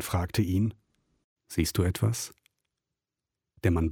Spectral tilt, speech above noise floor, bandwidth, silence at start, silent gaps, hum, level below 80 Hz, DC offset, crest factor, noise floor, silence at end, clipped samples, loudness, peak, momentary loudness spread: -5.5 dB/octave; 62 dB; 17.5 kHz; 0 s; 1.24-1.36 s; none; -44 dBFS; under 0.1%; 18 dB; -89 dBFS; 0 s; under 0.1%; -29 LUFS; -12 dBFS; 8 LU